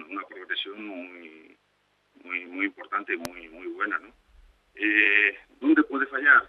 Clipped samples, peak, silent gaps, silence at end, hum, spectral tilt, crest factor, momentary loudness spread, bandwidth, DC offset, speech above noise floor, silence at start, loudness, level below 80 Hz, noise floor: under 0.1%; -4 dBFS; none; 0 s; 50 Hz at -75 dBFS; -3.5 dB/octave; 22 dB; 20 LU; 13 kHz; under 0.1%; 44 dB; 0 s; -25 LUFS; -66 dBFS; -69 dBFS